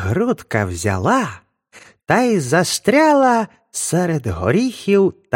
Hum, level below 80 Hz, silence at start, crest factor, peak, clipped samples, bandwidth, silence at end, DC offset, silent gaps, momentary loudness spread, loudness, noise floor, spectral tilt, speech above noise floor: none; -46 dBFS; 0 s; 16 dB; 0 dBFS; under 0.1%; 16.5 kHz; 0 s; under 0.1%; none; 7 LU; -17 LUFS; -47 dBFS; -5 dB/octave; 31 dB